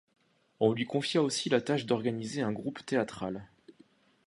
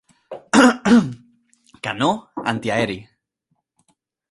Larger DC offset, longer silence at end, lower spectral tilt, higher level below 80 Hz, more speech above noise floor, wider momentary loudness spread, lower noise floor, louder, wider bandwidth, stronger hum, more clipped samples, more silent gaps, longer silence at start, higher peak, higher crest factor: neither; second, 0.55 s vs 1.3 s; about the same, -5 dB/octave vs -5 dB/octave; second, -70 dBFS vs -56 dBFS; second, 33 dB vs 54 dB; second, 9 LU vs 18 LU; second, -63 dBFS vs -72 dBFS; second, -31 LUFS vs -18 LUFS; about the same, 11.5 kHz vs 11.5 kHz; neither; neither; neither; first, 0.6 s vs 0.3 s; second, -12 dBFS vs 0 dBFS; about the same, 22 dB vs 20 dB